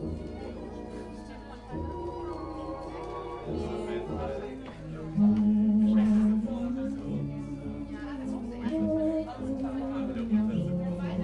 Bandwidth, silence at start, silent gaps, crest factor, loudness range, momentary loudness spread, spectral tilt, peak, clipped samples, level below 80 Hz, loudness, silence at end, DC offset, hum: 8.4 kHz; 0 s; none; 14 dB; 10 LU; 16 LU; -9 dB/octave; -16 dBFS; under 0.1%; -48 dBFS; -31 LUFS; 0 s; under 0.1%; none